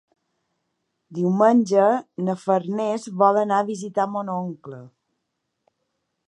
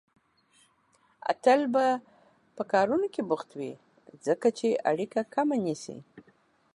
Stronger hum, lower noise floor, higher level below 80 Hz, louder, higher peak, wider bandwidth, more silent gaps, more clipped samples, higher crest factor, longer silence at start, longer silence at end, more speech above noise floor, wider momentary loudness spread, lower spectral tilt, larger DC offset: neither; first, -78 dBFS vs -67 dBFS; about the same, -76 dBFS vs -76 dBFS; first, -21 LUFS vs -28 LUFS; first, -4 dBFS vs -10 dBFS; about the same, 11 kHz vs 11.5 kHz; neither; neither; about the same, 20 dB vs 18 dB; second, 1.1 s vs 1.25 s; first, 1.4 s vs 0.55 s; first, 57 dB vs 40 dB; about the same, 16 LU vs 15 LU; first, -7 dB/octave vs -5.5 dB/octave; neither